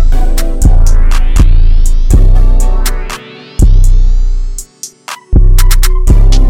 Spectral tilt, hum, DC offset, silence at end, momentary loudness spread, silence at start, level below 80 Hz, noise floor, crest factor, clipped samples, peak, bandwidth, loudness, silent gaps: -5 dB/octave; none; under 0.1%; 0 s; 14 LU; 0 s; -6 dBFS; -28 dBFS; 4 dB; under 0.1%; 0 dBFS; 15 kHz; -12 LUFS; none